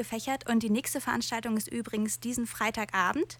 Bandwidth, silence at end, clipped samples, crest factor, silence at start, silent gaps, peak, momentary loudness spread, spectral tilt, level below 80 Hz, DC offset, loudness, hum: 19 kHz; 0.05 s; under 0.1%; 18 dB; 0 s; none; -14 dBFS; 5 LU; -3.5 dB/octave; -60 dBFS; under 0.1%; -30 LUFS; none